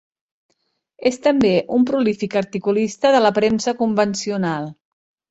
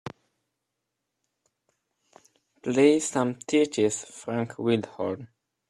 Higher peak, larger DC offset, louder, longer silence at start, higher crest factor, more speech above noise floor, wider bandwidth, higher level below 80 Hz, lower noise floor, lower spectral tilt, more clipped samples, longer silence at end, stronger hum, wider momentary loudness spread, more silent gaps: first, -2 dBFS vs -6 dBFS; neither; first, -19 LUFS vs -26 LUFS; first, 1 s vs 0.05 s; second, 16 dB vs 22 dB; second, 51 dB vs 58 dB; second, 8.2 kHz vs 12 kHz; first, -58 dBFS vs -70 dBFS; second, -69 dBFS vs -83 dBFS; about the same, -5 dB/octave vs -5 dB/octave; neither; about the same, 0.55 s vs 0.45 s; neither; second, 7 LU vs 13 LU; neither